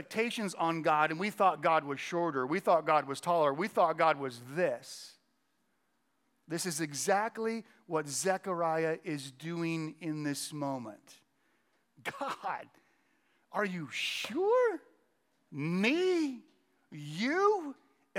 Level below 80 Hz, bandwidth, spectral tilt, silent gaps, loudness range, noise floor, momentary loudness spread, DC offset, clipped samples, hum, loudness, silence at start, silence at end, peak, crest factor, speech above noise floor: under -90 dBFS; 17 kHz; -4.5 dB/octave; none; 9 LU; -78 dBFS; 14 LU; under 0.1%; under 0.1%; none; -32 LUFS; 0 s; 0 s; -12 dBFS; 20 dB; 46 dB